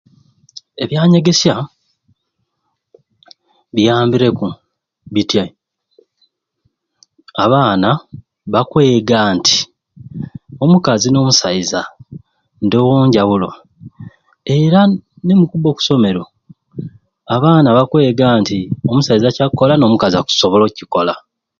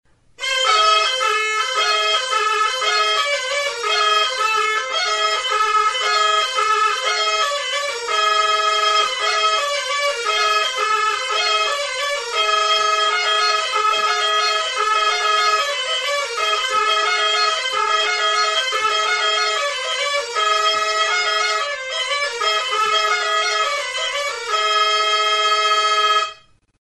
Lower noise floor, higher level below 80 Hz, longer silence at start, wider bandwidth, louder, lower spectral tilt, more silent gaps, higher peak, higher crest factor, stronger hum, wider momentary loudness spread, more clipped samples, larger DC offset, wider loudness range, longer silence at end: first, -71 dBFS vs -43 dBFS; first, -48 dBFS vs -64 dBFS; first, 0.8 s vs 0.4 s; second, 7.6 kHz vs 11.5 kHz; first, -13 LUFS vs -17 LUFS; first, -5.5 dB/octave vs 2.5 dB/octave; neither; first, 0 dBFS vs -4 dBFS; about the same, 14 dB vs 14 dB; neither; first, 17 LU vs 5 LU; neither; second, under 0.1% vs 0.1%; first, 6 LU vs 1 LU; about the same, 0.4 s vs 0.45 s